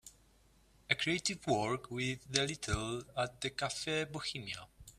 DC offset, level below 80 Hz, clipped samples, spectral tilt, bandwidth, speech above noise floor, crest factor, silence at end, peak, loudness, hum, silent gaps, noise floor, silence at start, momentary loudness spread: under 0.1%; -58 dBFS; under 0.1%; -3.5 dB/octave; 15 kHz; 30 dB; 28 dB; 0.1 s; -10 dBFS; -36 LUFS; none; none; -67 dBFS; 0.05 s; 6 LU